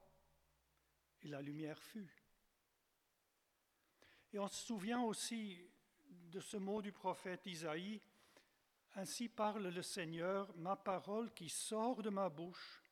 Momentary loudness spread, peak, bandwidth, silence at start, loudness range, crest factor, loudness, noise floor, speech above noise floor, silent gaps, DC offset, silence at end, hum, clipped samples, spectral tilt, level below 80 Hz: 13 LU; -28 dBFS; 18 kHz; 1.2 s; 12 LU; 20 dB; -46 LUFS; -84 dBFS; 38 dB; none; under 0.1%; 0.15 s; none; under 0.1%; -4 dB/octave; -86 dBFS